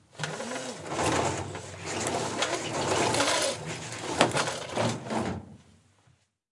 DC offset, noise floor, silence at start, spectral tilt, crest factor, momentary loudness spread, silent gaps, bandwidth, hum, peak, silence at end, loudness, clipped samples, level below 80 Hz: under 0.1%; -66 dBFS; 0.15 s; -3 dB/octave; 28 dB; 11 LU; none; 11.5 kHz; none; -2 dBFS; 0.95 s; -29 LUFS; under 0.1%; -62 dBFS